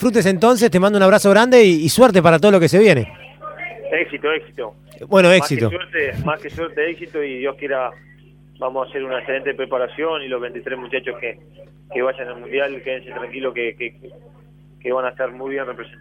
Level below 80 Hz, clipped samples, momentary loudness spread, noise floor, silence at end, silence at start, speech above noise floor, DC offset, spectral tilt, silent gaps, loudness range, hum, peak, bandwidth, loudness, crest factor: -52 dBFS; under 0.1%; 18 LU; -47 dBFS; 0.15 s; 0 s; 30 dB; under 0.1%; -5.5 dB/octave; none; 13 LU; 50 Hz at -45 dBFS; 0 dBFS; 16.5 kHz; -17 LUFS; 16 dB